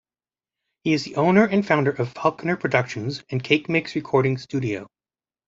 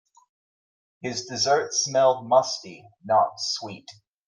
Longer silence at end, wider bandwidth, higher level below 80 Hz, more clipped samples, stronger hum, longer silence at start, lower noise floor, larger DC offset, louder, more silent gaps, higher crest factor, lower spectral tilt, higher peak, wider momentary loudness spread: first, 0.6 s vs 0.35 s; second, 7.8 kHz vs 10.5 kHz; first, -60 dBFS vs -74 dBFS; neither; neither; second, 0.85 s vs 1.05 s; about the same, under -90 dBFS vs under -90 dBFS; neither; about the same, -22 LUFS vs -23 LUFS; neither; about the same, 20 dB vs 20 dB; first, -6.5 dB/octave vs -2.5 dB/octave; first, -2 dBFS vs -6 dBFS; second, 11 LU vs 18 LU